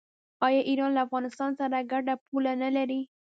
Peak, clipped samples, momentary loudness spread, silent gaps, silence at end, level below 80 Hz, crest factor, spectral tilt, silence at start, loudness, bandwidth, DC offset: -10 dBFS; under 0.1%; 5 LU; 2.21-2.32 s; 0.15 s; -82 dBFS; 18 dB; -5 dB/octave; 0.4 s; -28 LUFS; 7.8 kHz; under 0.1%